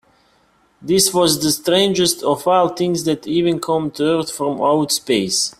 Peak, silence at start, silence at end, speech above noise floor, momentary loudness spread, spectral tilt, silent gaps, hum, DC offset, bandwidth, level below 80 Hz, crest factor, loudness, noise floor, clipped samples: 0 dBFS; 0.8 s; 0.1 s; 40 dB; 5 LU; -3.5 dB/octave; none; none; under 0.1%; 16 kHz; -54 dBFS; 16 dB; -17 LUFS; -57 dBFS; under 0.1%